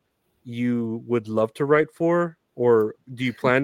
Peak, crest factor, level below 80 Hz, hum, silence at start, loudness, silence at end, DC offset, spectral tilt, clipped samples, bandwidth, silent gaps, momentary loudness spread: -4 dBFS; 18 dB; -68 dBFS; none; 0.45 s; -23 LUFS; 0 s; under 0.1%; -7.5 dB/octave; under 0.1%; 11.5 kHz; none; 9 LU